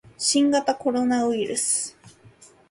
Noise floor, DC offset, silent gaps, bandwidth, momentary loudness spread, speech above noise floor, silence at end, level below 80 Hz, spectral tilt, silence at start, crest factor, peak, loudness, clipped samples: -52 dBFS; under 0.1%; none; 11.5 kHz; 5 LU; 30 dB; 0.6 s; -66 dBFS; -2 dB/octave; 0.2 s; 16 dB; -8 dBFS; -22 LUFS; under 0.1%